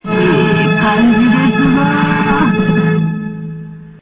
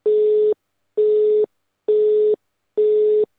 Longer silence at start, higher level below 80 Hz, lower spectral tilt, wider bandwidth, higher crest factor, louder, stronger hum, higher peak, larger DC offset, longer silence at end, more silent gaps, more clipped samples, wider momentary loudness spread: about the same, 0.05 s vs 0.05 s; first, -40 dBFS vs -80 dBFS; first, -11 dB/octave vs -8 dB/octave; about the same, 4 kHz vs 3.9 kHz; about the same, 10 dB vs 8 dB; first, -12 LUFS vs -19 LUFS; neither; first, 0 dBFS vs -10 dBFS; neither; about the same, 0.1 s vs 0.15 s; neither; neither; about the same, 14 LU vs 12 LU